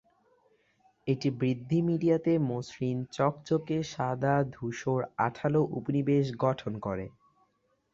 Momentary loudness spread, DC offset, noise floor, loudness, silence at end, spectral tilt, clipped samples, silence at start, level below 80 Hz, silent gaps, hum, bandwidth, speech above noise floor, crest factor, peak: 8 LU; under 0.1%; -73 dBFS; -30 LUFS; 0.85 s; -7.5 dB/octave; under 0.1%; 1.05 s; -62 dBFS; none; none; 7.6 kHz; 44 dB; 18 dB; -12 dBFS